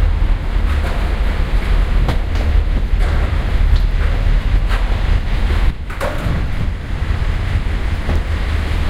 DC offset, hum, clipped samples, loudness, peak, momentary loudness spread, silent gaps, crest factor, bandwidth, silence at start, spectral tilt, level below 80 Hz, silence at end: under 0.1%; none; under 0.1%; -19 LUFS; -2 dBFS; 4 LU; none; 14 dB; 10 kHz; 0 s; -6.5 dB/octave; -16 dBFS; 0 s